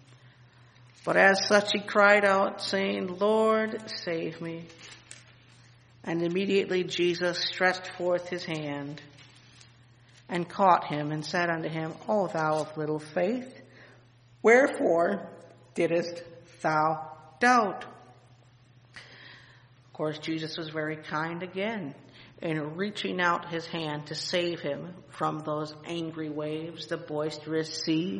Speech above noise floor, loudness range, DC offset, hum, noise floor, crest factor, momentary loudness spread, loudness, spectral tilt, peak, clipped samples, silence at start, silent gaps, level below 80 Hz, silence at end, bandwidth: 30 dB; 9 LU; under 0.1%; none; -57 dBFS; 24 dB; 19 LU; -28 LUFS; -5 dB/octave; -6 dBFS; under 0.1%; 0.25 s; none; -72 dBFS; 0 s; 10.5 kHz